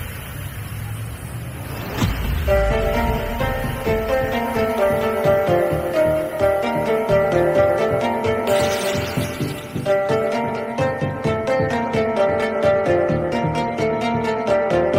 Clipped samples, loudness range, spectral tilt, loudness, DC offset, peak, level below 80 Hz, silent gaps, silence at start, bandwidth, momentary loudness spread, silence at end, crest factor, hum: under 0.1%; 3 LU; -6 dB/octave; -20 LUFS; under 0.1%; -4 dBFS; -32 dBFS; none; 0 s; 16 kHz; 12 LU; 0 s; 16 dB; none